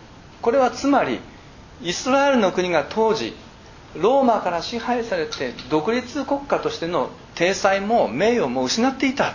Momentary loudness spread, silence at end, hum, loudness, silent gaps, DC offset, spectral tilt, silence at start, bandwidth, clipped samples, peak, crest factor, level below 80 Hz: 9 LU; 0 s; none; -21 LUFS; none; under 0.1%; -4 dB/octave; 0 s; 7.4 kHz; under 0.1%; -4 dBFS; 18 dB; -50 dBFS